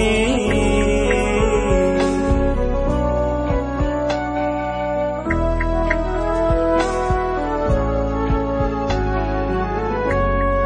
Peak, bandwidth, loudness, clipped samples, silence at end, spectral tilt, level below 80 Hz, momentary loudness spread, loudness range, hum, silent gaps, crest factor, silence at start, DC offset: -4 dBFS; 10 kHz; -20 LUFS; under 0.1%; 0 s; -6.5 dB/octave; -24 dBFS; 4 LU; 3 LU; none; none; 14 dB; 0 s; under 0.1%